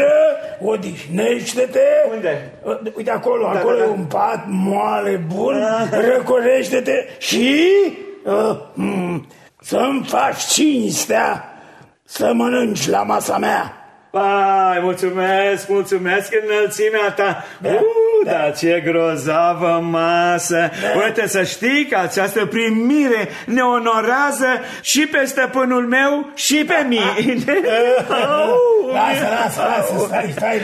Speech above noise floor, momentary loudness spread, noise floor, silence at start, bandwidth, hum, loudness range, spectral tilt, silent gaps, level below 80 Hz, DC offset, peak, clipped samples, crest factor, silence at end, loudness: 28 dB; 7 LU; -45 dBFS; 0 s; 13.5 kHz; none; 3 LU; -4 dB/octave; none; -64 dBFS; under 0.1%; -2 dBFS; under 0.1%; 14 dB; 0 s; -17 LUFS